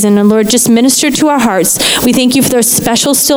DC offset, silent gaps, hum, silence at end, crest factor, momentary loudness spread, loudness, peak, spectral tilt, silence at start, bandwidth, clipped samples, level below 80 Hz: under 0.1%; none; none; 0 s; 8 dB; 2 LU; -8 LUFS; 0 dBFS; -3 dB/octave; 0 s; over 20 kHz; under 0.1%; -40 dBFS